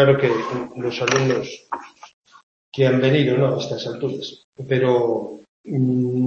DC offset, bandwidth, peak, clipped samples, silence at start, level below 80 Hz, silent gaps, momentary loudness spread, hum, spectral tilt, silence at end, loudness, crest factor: under 0.1%; 7.2 kHz; -2 dBFS; under 0.1%; 0 s; -62 dBFS; 2.13-2.22 s, 2.43-2.72 s, 4.44-4.53 s, 5.49-5.64 s; 15 LU; none; -6 dB/octave; 0 s; -20 LUFS; 18 dB